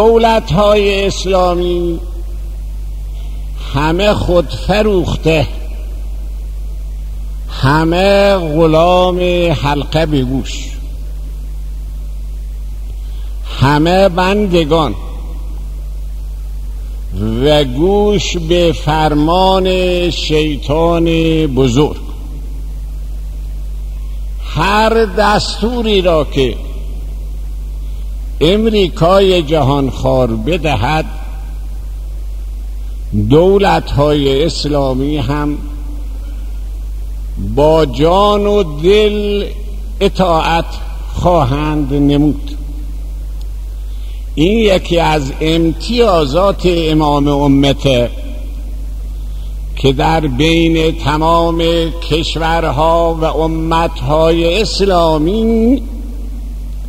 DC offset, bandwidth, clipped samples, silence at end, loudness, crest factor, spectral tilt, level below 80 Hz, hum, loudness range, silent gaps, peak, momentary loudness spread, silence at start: 0.8%; 15.5 kHz; under 0.1%; 0 s; -12 LUFS; 12 dB; -6 dB/octave; -20 dBFS; none; 5 LU; none; 0 dBFS; 16 LU; 0 s